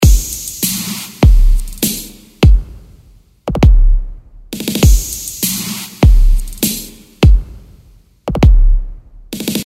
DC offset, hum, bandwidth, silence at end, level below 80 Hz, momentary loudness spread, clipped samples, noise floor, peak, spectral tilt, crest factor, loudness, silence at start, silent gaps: under 0.1%; none; 16.5 kHz; 0.05 s; -12 dBFS; 17 LU; under 0.1%; -45 dBFS; 0 dBFS; -5 dB/octave; 12 dB; -14 LUFS; 0 s; none